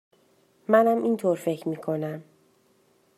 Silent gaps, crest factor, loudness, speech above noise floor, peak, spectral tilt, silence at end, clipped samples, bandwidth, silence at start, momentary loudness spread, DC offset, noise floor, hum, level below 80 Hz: none; 22 dB; -25 LUFS; 40 dB; -6 dBFS; -7 dB/octave; 0.95 s; under 0.1%; 13.5 kHz; 0.7 s; 16 LU; under 0.1%; -64 dBFS; none; -80 dBFS